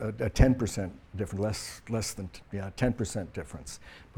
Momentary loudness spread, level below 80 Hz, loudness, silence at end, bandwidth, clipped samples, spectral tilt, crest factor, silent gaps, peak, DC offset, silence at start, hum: 17 LU; -38 dBFS; -31 LUFS; 0.15 s; 18 kHz; under 0.1%; -6 dB/octave; 24 dB; none; -8 dBFS; under 0.1%; 0 s; none